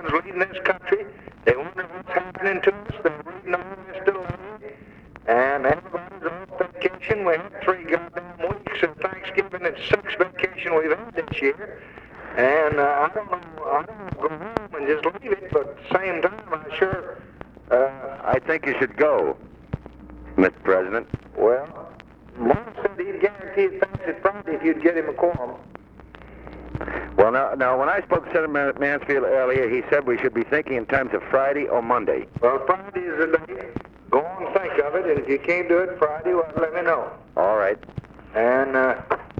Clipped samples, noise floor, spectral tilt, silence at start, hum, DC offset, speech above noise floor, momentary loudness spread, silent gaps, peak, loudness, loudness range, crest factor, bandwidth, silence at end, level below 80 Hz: under 0.1%; -45 dBFS; -7.5 dB/octave; 0 s; none; under 0.1%; 23 dB; 14 LU; none; -4 dBFS; -23 LUFS; 4 LU; 20 dB; 7 kHz; 0 s; -50 dBFS